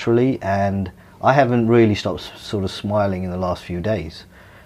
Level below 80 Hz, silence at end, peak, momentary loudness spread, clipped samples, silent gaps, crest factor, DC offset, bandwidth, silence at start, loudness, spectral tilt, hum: -46 dBFS; 0.45 s; -2 dBFS; 12 LU; under 0.1%; none; 18 dB; under 0.1%; 13.5 kHz; 0 s; -20 LUFS; -7.5 dB/octave; none